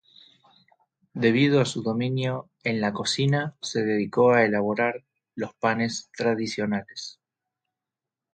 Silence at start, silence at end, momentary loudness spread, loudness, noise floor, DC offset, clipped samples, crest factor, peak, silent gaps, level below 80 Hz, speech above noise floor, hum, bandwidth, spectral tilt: 1.15 s; 1.25 s; 15 LU; -25 LUFS; -88 dBFS; under 0.1%; under 0.1%; 20 dB; -6 dBFS; none; -66 dBFS; 64 dB; none; 9.4 kHz; -5.5 dB/octave